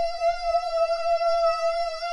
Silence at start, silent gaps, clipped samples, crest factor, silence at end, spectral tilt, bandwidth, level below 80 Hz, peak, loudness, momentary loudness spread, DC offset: 0 s; none; under 0.1%; 12 dB; 0 s; -0.5 dB/octave; 11.5 kHz; -46 dBFS; -14 dBFS; -24 LUFS; 3 LU; under 0.1%